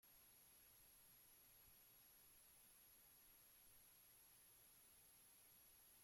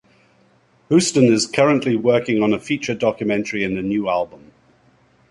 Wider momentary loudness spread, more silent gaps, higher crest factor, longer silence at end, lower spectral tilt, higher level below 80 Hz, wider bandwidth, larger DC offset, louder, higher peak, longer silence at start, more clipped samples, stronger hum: second, 0 LU vs 7 LU; neither; second, 12 dB vs 20 dB; second, 0 s vs 0.95 s; second, -0.5 dB/octave vs -5 dB/octave; second, -88 dBFS vs -56 dBFS; first, 16.5 kHz vs 11.5 kHz; neither; second, -68 LUFS vs -18 LUFS; second, -58 dBFS vs 0 dBFS; second, 0 s vs 0.9 s; neither; neither